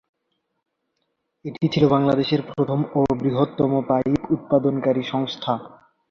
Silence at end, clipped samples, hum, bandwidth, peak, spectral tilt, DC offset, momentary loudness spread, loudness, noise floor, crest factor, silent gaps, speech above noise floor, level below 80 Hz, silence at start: 0.45 s; under 0.1%; none; 7 kHz; -4 dBFS; -8 dB/octave; under 0.1%; 8 LU; -21 LUFS; -75 dBFS; 18 dB; none; 54 dB; -52 dBFS; 1.45 s